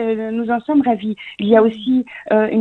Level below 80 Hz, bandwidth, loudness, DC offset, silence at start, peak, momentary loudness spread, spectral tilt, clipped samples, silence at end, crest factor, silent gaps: -58 dBFS; 4.2 kHz; -17 LUFS; under 0.1%; 0 s; 0 dBFS; 8 LU; -8.5 dB/octave; under 0.1%; 0 s; 16 dB; none